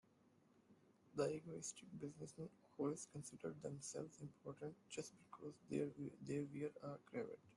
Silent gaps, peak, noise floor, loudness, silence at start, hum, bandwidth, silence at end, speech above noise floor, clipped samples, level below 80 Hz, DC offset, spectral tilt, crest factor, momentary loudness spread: none; -30 dBFS; -75 dBFS; -50 LUFS; 0.55 s; none; 12 kHz; 0 s; 25 dB; under 0.1%; -84 dBFS; under 0.1%; -5.5 dB/octave; 22 dB; 11 LU